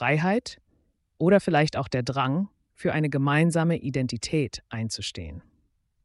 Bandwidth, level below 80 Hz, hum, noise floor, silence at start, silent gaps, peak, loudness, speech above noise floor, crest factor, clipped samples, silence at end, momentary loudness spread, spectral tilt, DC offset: 11.5 kHz; -54 dBFS; none; -69 dBFS; 0 s; none; -10 dBFS; -25 LUFS; 44 dB; 16 dB; under 0.1%; 0.65 s; 12 LU; -6 dB/octave; under 0.1%